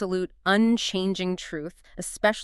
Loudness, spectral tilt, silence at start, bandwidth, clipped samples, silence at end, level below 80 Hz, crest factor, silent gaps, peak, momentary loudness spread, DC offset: -25 LUFS; -4.5 dB/octave; 0 s; 13 kHz; under 0.1%; 0 s; -54 dBFS; 20 dB; none; -6 dBFS; 15 LU; under 0.1%